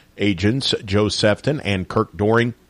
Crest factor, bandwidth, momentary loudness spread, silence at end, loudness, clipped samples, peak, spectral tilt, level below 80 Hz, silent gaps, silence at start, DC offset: 14 dB; 11.5 kHz; 4 LU; 0.15 s; -19 LUFS; under 0.1%; -6 dBFS; -5.5 dB/octave; -48 dBFS; none; 0.15 s; under 0.1%